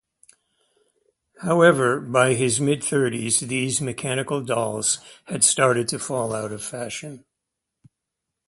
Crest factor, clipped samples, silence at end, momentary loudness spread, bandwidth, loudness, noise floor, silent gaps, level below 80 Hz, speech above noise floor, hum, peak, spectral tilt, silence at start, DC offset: 20 dB; under 0.1%; 1.3 s; 14 LU; 11.5 kHz; -21 LUFS; -83 dBFS; none; -62 dBFS; 61 dB; none; -4 dBFS; -3.5 dB/octave; 1.4 s; under 0.1%